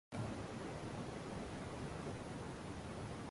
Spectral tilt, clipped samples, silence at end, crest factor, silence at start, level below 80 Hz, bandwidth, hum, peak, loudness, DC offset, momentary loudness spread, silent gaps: -6 dB/octave; under 0.1%; 0 s; 14 dB; 0.1 s; -58 dBFS; 11.5 kHz; none; -32 dBFS; -47 LUFS; under 0.1%; 2 LU; none